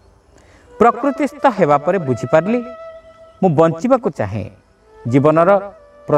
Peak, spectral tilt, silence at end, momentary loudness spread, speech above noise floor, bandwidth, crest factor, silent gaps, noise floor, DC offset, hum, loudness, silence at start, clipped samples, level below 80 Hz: 0 dBFS; -8 dB/octave; 0 s; 19 LU; 34 dB; 10.5 kHz; 16 dB; none; -48 dBFS; under 0.1%; none; -15 LUFS; 0.8 s; under 0.1%; -52 dBFS